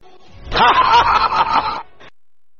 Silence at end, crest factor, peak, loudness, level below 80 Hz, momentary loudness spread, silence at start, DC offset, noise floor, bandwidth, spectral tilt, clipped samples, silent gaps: 0.75 s; 14 dB; -2 dBFS; -14 LUFS; -38 dBFS; 12 LU; 0.35 s; 1%; -70 dBFS; 7 kHz; -3.5 dB/octave; under 0.1%; none